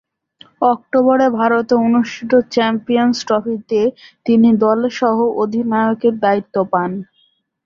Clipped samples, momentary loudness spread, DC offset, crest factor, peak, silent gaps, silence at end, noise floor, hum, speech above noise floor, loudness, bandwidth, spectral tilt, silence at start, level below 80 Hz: under 0.1%; 6 LU; under 0.1%; 14 dB; -2 dBFS; none; 0.65 s; -60 dBFS; none; 45 dB; -15 LUFS; 7.2 kHz; -6 dB/octave; 0.6 s; -60 dBFS